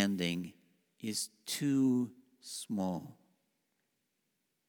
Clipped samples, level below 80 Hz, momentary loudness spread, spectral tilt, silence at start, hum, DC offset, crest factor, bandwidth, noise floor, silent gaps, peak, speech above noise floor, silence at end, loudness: under 0.1%; -78 dBFS; 15 LU; -4.5 dB/octave; 0 s; none; under 0.1%; 24 dB; over 20 kHz; -82 dBFS; none; -12 dBFS; 48 dB; 1.55 s; -35 LUFS